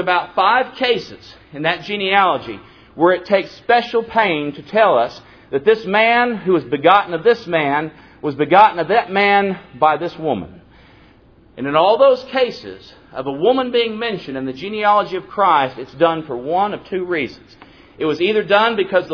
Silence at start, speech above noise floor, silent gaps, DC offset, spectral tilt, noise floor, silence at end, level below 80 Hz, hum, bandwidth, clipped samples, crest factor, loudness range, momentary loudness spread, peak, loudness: 0 s; 32 dB; none; under 0.1%; -6.5 dB/octave; -48 dBFS; 0 s; -54 dBFS; none; 5.4 kHz; under 0.1%; 18 dB; 4 LU; 12 LU; 0 dBFS; -17 LUFS